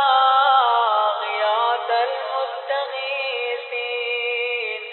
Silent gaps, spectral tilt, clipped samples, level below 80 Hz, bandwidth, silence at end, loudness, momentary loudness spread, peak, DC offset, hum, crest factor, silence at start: none; -0.5 dB/octave; under 0.1%; under -90 dBFS; 4.3 kHz; 0 s; -20 LUFS; 10 LU; -4 dBFS; under 0.1%; none; 16 dB; 0 s